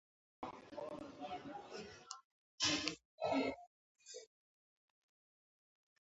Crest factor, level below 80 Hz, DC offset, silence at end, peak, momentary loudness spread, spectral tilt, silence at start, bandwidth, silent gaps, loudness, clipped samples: 28 dB; -76 dBFS; under 0.1%; 1.9 s; -20 dBFS; 18 LU; -1.5 dB/octave; 0.4 s; 8 kHz; 2.24-2.58 s, 3.05-3.18 s, 3.67-3.95 s; -43 LUFS; under 0.1%